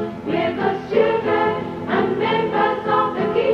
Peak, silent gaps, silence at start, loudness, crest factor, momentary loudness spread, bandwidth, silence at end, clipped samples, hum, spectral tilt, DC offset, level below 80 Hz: -4 dBFS; none; 0 s; -20 LUFS; 16 dB; 4 LU; 6.8 kHz; 0 s; under 0.1%; none; -7.5 dB/octave; under 0.1%; -52 dBFS